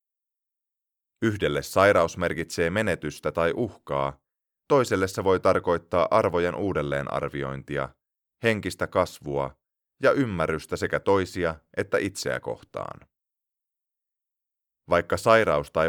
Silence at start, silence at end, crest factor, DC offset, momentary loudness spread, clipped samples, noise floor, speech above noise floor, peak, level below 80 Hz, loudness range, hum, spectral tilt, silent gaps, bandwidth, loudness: 1.2 s; 0 s; 22 dB; under 0.1%; 11 LU; under 0.1%; -87 dBFS; 63 dB; -4 dBFS; -52 dBFS; 5 LU; none; -5.5 dB/octave; none; 19 kHz; -25 LUFS